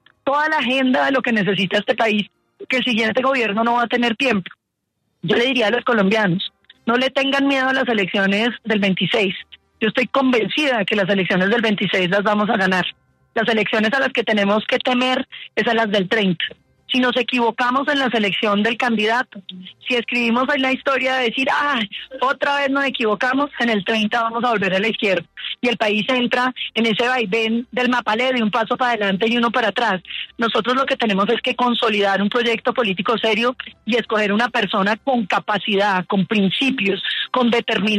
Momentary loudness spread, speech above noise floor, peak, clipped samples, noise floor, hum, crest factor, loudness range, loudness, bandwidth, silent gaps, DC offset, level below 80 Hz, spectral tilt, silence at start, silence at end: 5 LU; 56 dB; -4 dBFS; under 0.1%; -74 dBFS; none; 14 dB; 1 LU; -18 LUFS; 12.5 kHz; none; under 0.1%; -62 dBFS; -5 dB/octave; 0.25 s; 0 s